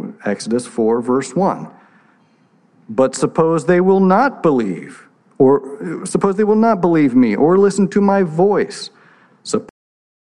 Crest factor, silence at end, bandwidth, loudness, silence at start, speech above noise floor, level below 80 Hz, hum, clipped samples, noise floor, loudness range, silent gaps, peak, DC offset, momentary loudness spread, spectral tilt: 14 dB; 0.55 s; 11 kHz; -15 LUFS; 0 s; 40 dB; -60 dBFS; none; under 0.1%; -55 dBFS; 4 LU; none; -2 dBFS; under 0.1%; 12 LU; -6.5 dB/octave